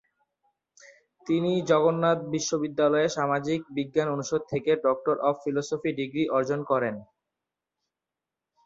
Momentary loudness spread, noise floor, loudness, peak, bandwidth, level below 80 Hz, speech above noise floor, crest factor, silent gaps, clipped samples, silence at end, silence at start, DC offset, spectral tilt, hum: 7 LU; -88 dBFS; -26 LUFS; -8 dBFS; 7.8 kHz; -68 dBFS; 63 dB; 18 dB; none; under 0.1%; 1.6 s; 0.85 s; under 0.1%; -5.5 dB/octave; none